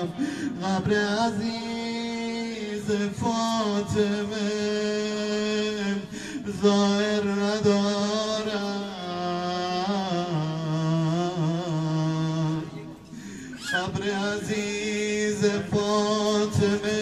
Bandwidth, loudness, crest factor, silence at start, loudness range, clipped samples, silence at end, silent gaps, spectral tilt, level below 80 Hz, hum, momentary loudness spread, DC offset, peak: 12.5 kHz; -26 LUFS; 18 dB; 0 s; 3 LU; under 0.1%; 0 s; none; -5.5 dB/octave; -58 dBFS; none; 8 LU; under 0.1%; -8 dBFS